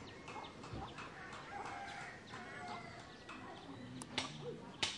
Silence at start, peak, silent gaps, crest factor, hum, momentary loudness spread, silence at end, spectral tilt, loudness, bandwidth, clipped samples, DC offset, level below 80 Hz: 0 s; -22 dBFS; none; 26 dB; none; 9 LU; 0 s; -3 dB/octave; -48 LUFS; 11.5 kHz; under 0.1%; under 0.1%; -68 dBFS